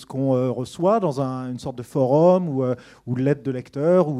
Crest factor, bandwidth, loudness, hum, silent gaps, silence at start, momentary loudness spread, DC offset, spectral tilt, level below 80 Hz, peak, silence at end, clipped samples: 18 dB; 12 kHz; -22 LUFS; none; none; 0 s; 13 LU; under 0.1%; -8.5 dB/octave; -62 dBFS; -4 dBFS; 0 s; under 0.1%